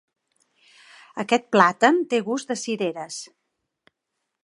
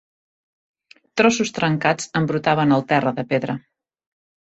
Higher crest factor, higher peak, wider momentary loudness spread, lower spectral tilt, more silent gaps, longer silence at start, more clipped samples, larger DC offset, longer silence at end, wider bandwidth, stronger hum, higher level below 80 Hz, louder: about the same, 24 dB vs 20 dB; about the same, 0 dBFS vs -2 dBFS; first, 18 LU vs 8 LU; about the same, -4 dB/octave vs -5 dB/octave; neither; about the same, 1.15 s vs 1.15 s; neither; neither; first, 1.2 s vs 1 s; first, 11.5 kHz vs 8.2 kHz; neither; second, -78 dBFS vs -60 dBFS; about the same, -22 LUFS vs -20 LUFS